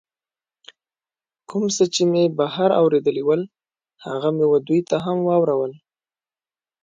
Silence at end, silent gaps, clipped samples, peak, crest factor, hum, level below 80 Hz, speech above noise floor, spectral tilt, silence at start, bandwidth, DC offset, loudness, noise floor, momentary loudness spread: 1.05 s; none; under 0.1%; -6 dBFS; 16 dB; none; -68 dBFS; over 71 dB; -5.5 dB/octave; 1.5 s; 9.4 kHz; under 0.1%; -20 LUFS; under -90 dBFS; 11 LU